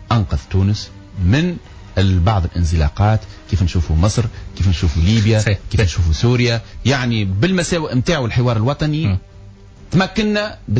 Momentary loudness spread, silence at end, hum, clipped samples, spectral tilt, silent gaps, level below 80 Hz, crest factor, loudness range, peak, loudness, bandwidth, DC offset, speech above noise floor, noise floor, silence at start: 6 LU; 0 s; none; under 0.1%; -6 dB/octave; none; -24 dBFS; 12 dB; 2 LU; -4 dBFS; -17 LUFS; 8 kHz; under 0.1%; 23 dB; -39 dBFS; 0 s